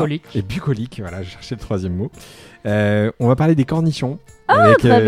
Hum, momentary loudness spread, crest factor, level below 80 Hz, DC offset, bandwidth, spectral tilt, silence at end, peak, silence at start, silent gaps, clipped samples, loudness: none; 18 LU; 16 dB; -44 dBFS; under 0.1%; 13.5 kHz; -7.5 dB/octave; 0 s; 0 dBFS; 0 s; none; under 0.1%; -17 LUFS